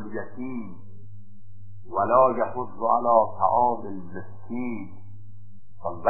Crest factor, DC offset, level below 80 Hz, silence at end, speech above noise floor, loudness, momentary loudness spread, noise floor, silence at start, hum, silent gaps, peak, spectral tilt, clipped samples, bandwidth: 20 dB; 2%; -56 dBFS; 0 s; 26 dB; -24 LUFS; 18 LU; -50 dBFS; 0 s; none; none; -6 dBFS; -14 dB/octave; under 0.1%; 2.7 kHz